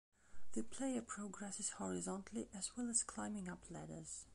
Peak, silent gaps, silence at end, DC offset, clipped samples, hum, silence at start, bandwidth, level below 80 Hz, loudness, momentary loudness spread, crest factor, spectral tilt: -24 dBFS; none; 0 s; under 0.1%; under 0.1%; none; 0.1 s; 11.5 kHz; -70 dBFS; -45 LUFS; 11 LU; 22 dB; -3.5 dB/octave